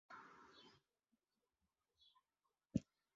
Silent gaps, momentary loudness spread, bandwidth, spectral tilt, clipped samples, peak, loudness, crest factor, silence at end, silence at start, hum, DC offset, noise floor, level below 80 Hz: none; 19 LU; 7.4 kHz; -7 dB/octave; under 0.1%; -26 dBFS; -50 LUFS; 30 dB; 0.35 s; 0.1 s; none; under 0.1%; under -90 dBFS; -74 dBFS